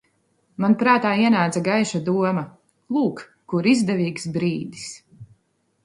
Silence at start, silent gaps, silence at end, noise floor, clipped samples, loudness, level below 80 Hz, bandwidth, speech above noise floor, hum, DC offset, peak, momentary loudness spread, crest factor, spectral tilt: 0.6 s; none; 0.6 s; -68 dBFS; under 0.1%; -21 LUFS; -64 dBFS; 11.5 kHz; 48 dB; none; under 0.1%; -2 dBFS; 18 LU; 20 dB; -6 dB/octave